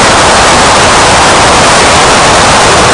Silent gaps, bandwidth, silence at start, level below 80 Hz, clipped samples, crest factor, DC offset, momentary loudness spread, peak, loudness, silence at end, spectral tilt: none; 12 kHz; 0 s; -22 dBFS; 2%; 4 dB; under 0.1%; 0 LU; 0 dBFS; -3 LUFS; 0 s; -2.5 dB/octave